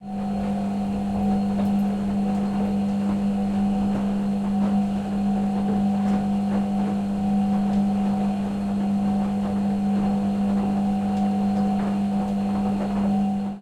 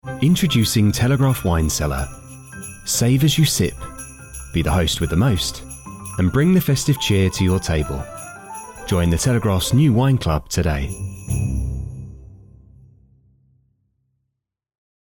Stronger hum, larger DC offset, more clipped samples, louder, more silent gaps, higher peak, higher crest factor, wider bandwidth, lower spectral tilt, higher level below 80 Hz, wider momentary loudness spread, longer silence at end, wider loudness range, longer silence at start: first, 50 Hz at -25 dBFS vs none; neither; neither; second, -23 LUFS vs -19 LUFS; neither; second, -12 dBFS vs -6 dBFS; about the same, 10 dB vs 14 dB; second, 9.2 kHz vs 19.5 kHz; first, -8.5 dB/octave vs -5 dB/octave; second, -46 dBFS vs -34 dBFS; second, 3 LU vs 18 LU; second, 0 s vs 2.7 s; second, 1 LU vs 8 LU; about the same, 0 s vs 0.05 s